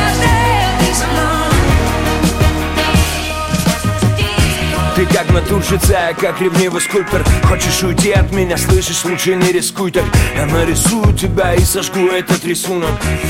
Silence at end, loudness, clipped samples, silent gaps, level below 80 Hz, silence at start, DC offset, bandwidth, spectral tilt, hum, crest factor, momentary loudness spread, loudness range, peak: 0 s; -13 LUFS; under 0.1%; none; -20 dBFS; 0 s; under 0.1%; 17 kHz; -4.5 dB/octave; none; 12 dB; 3 LU; 1 LU; 0 dBFS